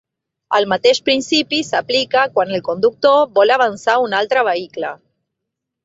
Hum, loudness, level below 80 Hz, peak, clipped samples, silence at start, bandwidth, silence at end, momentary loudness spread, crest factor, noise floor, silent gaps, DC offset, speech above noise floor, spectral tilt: none; -15 LUFS; -62 dBFS; 0 dBFS; under 0.1%; 0.5 s; 8 kHz; 0.9 s; 7 LU; 16 dB; -79 dBFS; none; under 0.1%; 64 dB; -3 dB/octave